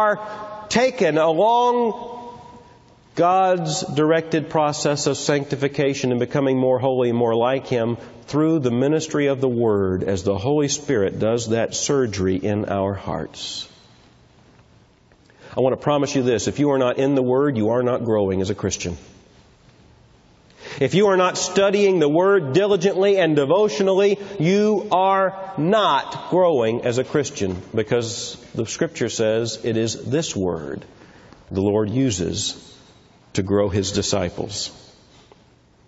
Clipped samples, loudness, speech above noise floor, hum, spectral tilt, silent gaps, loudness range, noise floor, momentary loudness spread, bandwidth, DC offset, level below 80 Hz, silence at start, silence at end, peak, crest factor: under 0.1%; -20 LUFS; 34 dB; none; -5 dB/octave; none; 7 LU; -54 dBFS; 10 LU; 8 kHz; under 0.1%; -48 dBFS; 0 s; 1.1 s; -2 dBFS; 18 dB